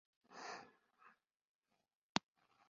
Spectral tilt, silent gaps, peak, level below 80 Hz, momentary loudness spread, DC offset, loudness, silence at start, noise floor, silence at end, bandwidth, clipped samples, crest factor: -2 dB/octave; 1.41-1.61 s, 1.95-2.15 s; -16 dBFS; -84 dBFS; 25 LU; under 0.1%; -47 LUFS; 0.3 s; -71 dBFS; 0.5 s; 7.2 kHz; under 0.1%; 36 dB